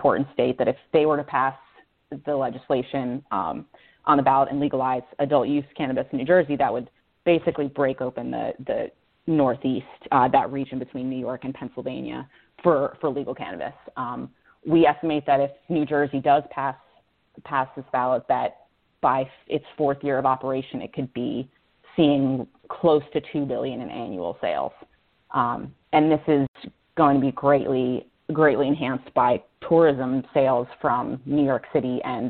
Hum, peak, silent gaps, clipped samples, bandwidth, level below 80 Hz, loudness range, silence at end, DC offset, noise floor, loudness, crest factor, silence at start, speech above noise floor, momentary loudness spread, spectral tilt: none; -4 dBFS; 26.48-26.54 s; under 0.1%; 4.4 kHz; -60 dBFS; 4 LU; 0 s; under 0.1%; -62 dBFS; -24 LUFS; 20 dB; 0 s; 39 dB; 12 LU; -11 dB/octave